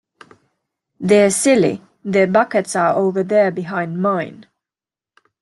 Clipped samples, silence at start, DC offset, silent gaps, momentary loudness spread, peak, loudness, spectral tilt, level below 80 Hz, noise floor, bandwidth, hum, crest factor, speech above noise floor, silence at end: under 0.1%; 1 s; under 0.1%; none; 10 LU; -2 dBFS; -16 LUFS; -5 dB/octave; -62 dBFS; under -90 dBFS; 12.5 kHz; none; 16 dB; over 74 dB; 1 s